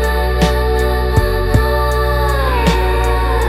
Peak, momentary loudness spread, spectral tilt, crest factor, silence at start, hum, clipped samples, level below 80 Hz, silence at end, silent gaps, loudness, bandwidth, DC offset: 0 dBFS; 1 LU; -6 dB/octave; 14 dB; 0 s; none; under 0.1%; -16 dBFS; 0 s; none; -15 LUFS; 15 kHz; under 0.1%